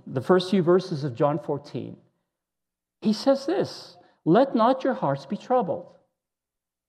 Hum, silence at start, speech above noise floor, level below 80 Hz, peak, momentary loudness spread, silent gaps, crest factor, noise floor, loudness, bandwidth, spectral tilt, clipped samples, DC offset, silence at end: none; 0.05 s; 64 dB; -78 dBFS; -6 dBFS; 12 LU; none; 20 dB; -87 dBFS; -24 LUFS; 10 kHz; -7 dB/octave; under 0.1%; under 0.1%; 1.05 s